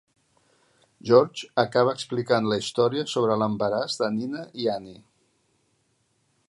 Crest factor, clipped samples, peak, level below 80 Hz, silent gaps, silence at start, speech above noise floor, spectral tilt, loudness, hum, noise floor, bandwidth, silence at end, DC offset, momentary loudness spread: 22 dB; under 0.1%; -4 dBFS; -68 dBFS; none; 1.05 s; 46 dB; -5.5 dB/octave; -24 LUFS; none; -70 dBFS; 11.5 kHz; 1.55 s; under 0.1%; 10 LU